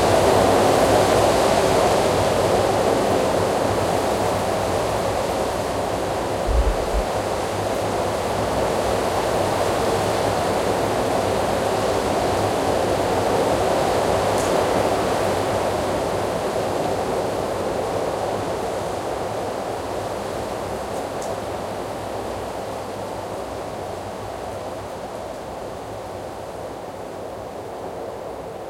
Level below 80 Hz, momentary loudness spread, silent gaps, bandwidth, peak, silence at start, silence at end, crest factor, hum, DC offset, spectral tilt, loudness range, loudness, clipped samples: -36 dBFS; 14 LU; none; 16.5 kHz; -4 dBFS; 0 s; 0 s; 18 dB; none; under 0.1%; -4.5 dB/octave; 12 LU; -22 LUFS; under 0.1%